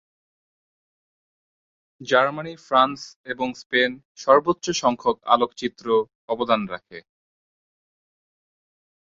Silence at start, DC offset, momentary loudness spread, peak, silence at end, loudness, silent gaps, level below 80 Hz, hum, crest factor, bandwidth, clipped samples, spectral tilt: 2 s; under 0.1%; 14 LU; -2 dBFS; 2.1 s; -22 LUFS; 3.16-3.24 s, 3.66-3.70 s, 4.05-4.15 s, 6.15-6.28 s; -64 dBFS; none; 22 dB; 7.8 kHz; under 0.1%; -3.5 dB/octave